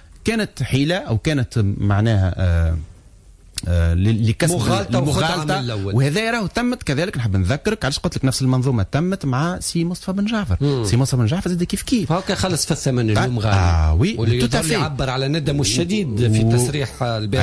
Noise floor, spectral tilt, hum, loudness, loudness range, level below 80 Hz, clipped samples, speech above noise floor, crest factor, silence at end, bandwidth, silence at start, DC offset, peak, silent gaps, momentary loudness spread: -46 dBFS; -5.5 dB/octave; none; -19 LUFS; 2 LU; -32 dBFS; under 0.1%; 27 dB; 12 dB; 0 s; 11 kHz; 0.15 s; under 0.1%; -6 dBFS; none; 4 LU